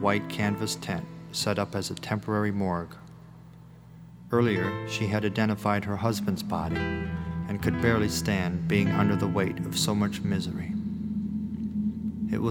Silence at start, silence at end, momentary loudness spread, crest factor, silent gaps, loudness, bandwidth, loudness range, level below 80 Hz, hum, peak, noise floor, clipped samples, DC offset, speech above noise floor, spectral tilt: 0 s; 0 s; 8 LU; 20 dB; none; -28 LUFS; 17.5 kHz; 4 LU; -50 dBFS; 60 Hz at -50 dBFS; -8 dBFS; -49 dBFS; under 0.1%; under 0.1%; 21 dB; -5.5 dB/octave